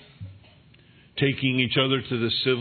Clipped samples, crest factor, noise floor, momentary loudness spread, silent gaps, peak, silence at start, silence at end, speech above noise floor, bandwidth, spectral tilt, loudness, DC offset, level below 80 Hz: under 0.1%; 18 dB; -54 dBFS; 22 LU; none; -8 dBFS; 0.2 s; 0 s; 31 dB; 4.6 kHz; -8.5 dB/octave; -23 LUFS; under 0.1%; -62 dBFS